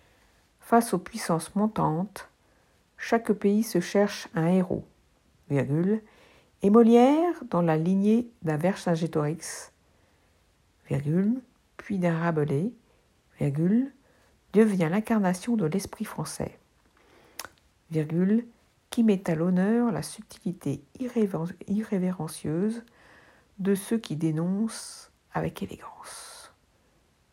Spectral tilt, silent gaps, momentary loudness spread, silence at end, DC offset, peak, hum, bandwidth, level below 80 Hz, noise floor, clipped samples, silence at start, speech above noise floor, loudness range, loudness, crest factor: -7 dB/octave; none; 15 LU; 0.85 s; under 0.1%; -6 dBFS; none; 16 kHz; -64 dBFS; -65 dBFS; under 0.1%; 0.65 s; 40 dB; 8 LU; -27 LUFS; 20 dB